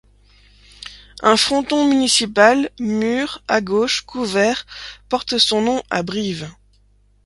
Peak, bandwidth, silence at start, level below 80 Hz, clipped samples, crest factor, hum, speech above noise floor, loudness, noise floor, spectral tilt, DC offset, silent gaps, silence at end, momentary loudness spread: 0 dBFS; 11.5 kHz; 0.8 s; -50 dBFS; under 0.1%; 18 dB; 50 Hz at -45 dBFS; 37 dB; -17 LUFS; -55 dBFS; -3 dB/octave; under 0.1%; none; 0.75 s; 19 LU